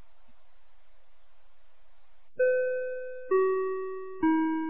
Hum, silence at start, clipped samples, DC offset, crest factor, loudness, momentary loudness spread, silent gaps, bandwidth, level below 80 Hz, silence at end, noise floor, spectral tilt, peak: none; 2.4 s; under 0.1%; 0.9%; 16 dB; -29 LUFS; 12 LU; none; 3.8 kHz; -68 dBFS; 0 s; -64 dBFS; -4.5 dB/octave; -16 dBFS